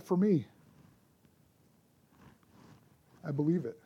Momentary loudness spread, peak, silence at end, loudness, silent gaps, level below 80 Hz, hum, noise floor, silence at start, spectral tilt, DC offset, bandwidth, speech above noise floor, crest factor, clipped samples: 18 LU; -18 dBFS; 0.1 s; -32 LUFS; none; -76 dBFS; none; -67 dBFS; 0.05 s; -9.5 dB/octave; under 0.1%; 15 kHz; 37 dB; 18 dB; under 0.1%